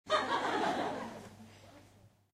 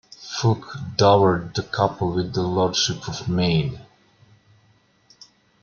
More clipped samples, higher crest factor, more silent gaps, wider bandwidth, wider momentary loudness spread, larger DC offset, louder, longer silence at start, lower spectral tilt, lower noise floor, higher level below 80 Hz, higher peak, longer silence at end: neither; about the same, 20 dB vs 20 dB; neither; first, 15.5 kHz vs 7.2 kHz; first, 23 LU vs 12 LU; neither; second, -35 LUFS vs -22 LUFS; second, 0.05 s vs 0.2 s; second, -3.5 dB/octave vs -5 dB/octave; about the same, -63 dBFS vs -60 dBFS; second, -72 dBFS vs -52 dBFS; second, -18 dBFS vs -2 dBFS; second, 0.25 s vs 1.8 s